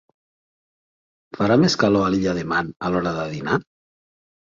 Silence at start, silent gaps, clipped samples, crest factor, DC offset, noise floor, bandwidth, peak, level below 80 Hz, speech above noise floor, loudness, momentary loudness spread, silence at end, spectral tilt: 1.35 s; 2.76-2.80 s; under 0.1%; 18 dB; under 0.1%; under -90 dBFS; 7.6 kHz; -4 dBFS; -52 dBFS; over 70 dB; -21 LUFS; 8 LU; 0.9 s; -5.5 dB/octave